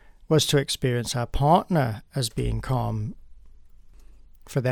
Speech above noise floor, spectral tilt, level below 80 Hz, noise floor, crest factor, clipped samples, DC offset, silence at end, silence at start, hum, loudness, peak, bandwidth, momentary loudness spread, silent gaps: 24 dB; -5 dB/octave; -40 dBFS; -47 dBFS; 18 dB; under 0.1%; under 0.1%; 0 s; 0.3 s; none; -25 LUFS; -6 dBFS; 19.5 kHz; 9 LU; none